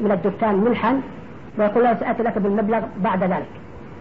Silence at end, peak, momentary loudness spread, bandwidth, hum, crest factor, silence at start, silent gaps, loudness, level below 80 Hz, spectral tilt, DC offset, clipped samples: 0 s; -8 dBFS; 17 LU; 5 kHz; none; 14 dB; 0 s; none; -20 LUFS; -52 dBFS; -10 dB/octave; 0.7%; under 0.1%